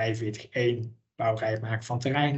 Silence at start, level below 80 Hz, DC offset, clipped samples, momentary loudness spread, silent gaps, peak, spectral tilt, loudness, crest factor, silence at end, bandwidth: 0 s; -66 dBFS; under 0.1%; under 0.1%; 6 LU; none; -10 dBFS; -6.5 dB/octave; -29 LUFS; 18 dB; 0 s; 8.4 kHz